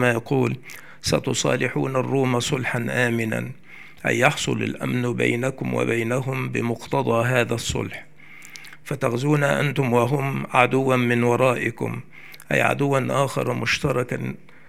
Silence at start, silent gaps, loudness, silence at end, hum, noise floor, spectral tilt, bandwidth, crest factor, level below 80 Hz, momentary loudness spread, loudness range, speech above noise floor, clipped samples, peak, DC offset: 0 s; none; -22 LUFS; 0.35 s; none; -44 dBFS; -5.5 dB/octave; 15.5 kHz; 22 dB; -54 dBFS; 13 LU; 3 LU; 22 dB; under 0.1%; 0 dBFS; 0.6%